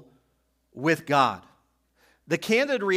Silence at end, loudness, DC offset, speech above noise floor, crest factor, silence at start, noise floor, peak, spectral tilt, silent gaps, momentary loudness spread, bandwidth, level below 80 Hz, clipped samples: 0 s; -24 LUFS; under 0.1%; 47 dB; 20 dB; 0.75 s; -71 dBFS; -6 dBFS; -5 dB/octave; none; 8 LU; 16 kHz; -72 dBFS; under 0.1%